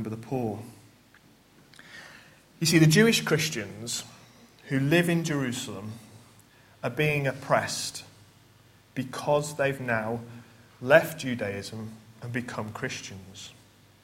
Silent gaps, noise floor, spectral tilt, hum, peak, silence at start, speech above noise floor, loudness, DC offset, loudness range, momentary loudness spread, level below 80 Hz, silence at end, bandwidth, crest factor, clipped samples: none; -58 dBFS; -4.5 dB/octave; none; -2 dBFS; 0 s; 31 dB; -27 LUFS; under 0.1%; 6 LU; 22 LU; -64 dBFS; 0.5 s; 16.5 kHz; 26 dB; under 0.1%